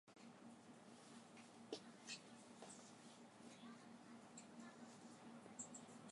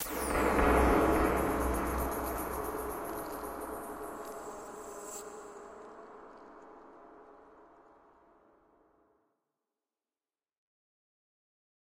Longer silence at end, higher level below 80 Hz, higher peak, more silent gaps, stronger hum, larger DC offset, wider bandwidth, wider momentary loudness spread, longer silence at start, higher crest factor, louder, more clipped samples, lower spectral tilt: second, 0 s vs 4.3 s; second, under -90 dBFS vs -44 dBFS; second, -36 dBFS vs -14 dBFS; neither; neither; neither; second, 11.5 kHz vs 16 kHz; second, 8 LU vs 26 LU; about the same, 0.05 s vs 0 s; about the same, 24 dB vs 22 dB; second, -60 LUFS vs -33 LUFS; neither; second, -3 dB/octave vs -5.5 dB/octave